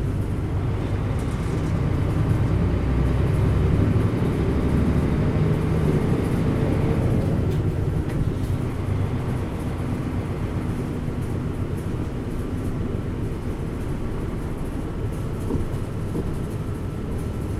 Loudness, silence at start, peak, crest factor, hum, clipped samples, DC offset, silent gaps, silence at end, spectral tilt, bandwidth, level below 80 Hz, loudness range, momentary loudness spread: -25 LUFS; 0 s; -8 dBFS; 16 dB; none; under 0.1%; under 0.1%; none; 0 s; -8.5 dB/octave; 13.5 kHz; -30 dBFS; 7 LU; 8 LU